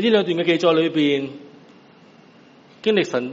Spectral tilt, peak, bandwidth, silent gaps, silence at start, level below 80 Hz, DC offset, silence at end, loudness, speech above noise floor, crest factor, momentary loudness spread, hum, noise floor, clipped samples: -3.5 dB/octave; -4 dBFS; 7.8 kHz; none; 0 s; -68 dBFS; under 0.1%; 0 s; -19 LUFS; 30 dB; 16 dB; 10 LU; none; -49 dBFS; under 0.1%